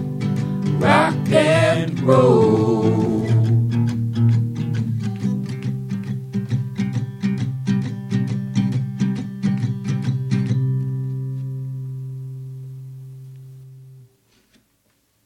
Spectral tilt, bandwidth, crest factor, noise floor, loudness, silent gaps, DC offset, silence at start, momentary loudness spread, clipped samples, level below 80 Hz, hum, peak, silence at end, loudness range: -7.5 dB/octave; 11 kHz; 20 dB; -64 dBFS; -20 LUFS; none; under 0.1%; 0 s; 17 LU; under 0.1%; -52 dBFS; none; -2 dBFS; 1.25 s; 14 LU